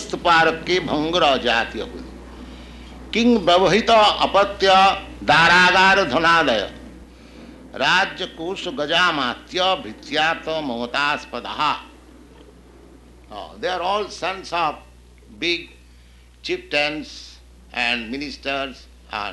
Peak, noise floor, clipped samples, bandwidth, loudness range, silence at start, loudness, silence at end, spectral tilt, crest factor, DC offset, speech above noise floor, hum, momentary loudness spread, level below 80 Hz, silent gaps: -2 dBFS; -48 dBFS; under 0.1%; 12 kHz; 12 LU; 0 s; -19 LUFS; 0 s; -3.5 dB/octave; 18 dB; under 0.1%; 28 dB; none; 20 LU; -44 dBFS; none